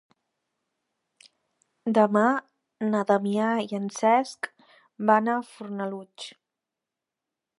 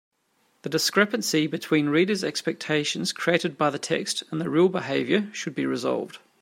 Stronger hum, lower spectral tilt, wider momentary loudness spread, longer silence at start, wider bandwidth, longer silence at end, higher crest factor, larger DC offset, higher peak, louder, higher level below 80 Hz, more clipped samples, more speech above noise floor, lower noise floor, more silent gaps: neither; first, -5.5 dB/octave vs -4 dB/octave; first, 15 LU vs 7 LU; first, 1.85 s vs 0.65 s; second, 11.5 kHz vs 16 kHz; first, 1.3 s vs 0.25 s; about the same, 22 dB vs 20 dB; neither; about the same, -6 dBFS vs -4 dBFS; about the same, -25 LUFS vs -25 LUFS; second, -80 dBFS vs -72 dBFS; neither; first, 63 dB vs 43 dB; first, -87 dBFS vs -68 dBFS; neither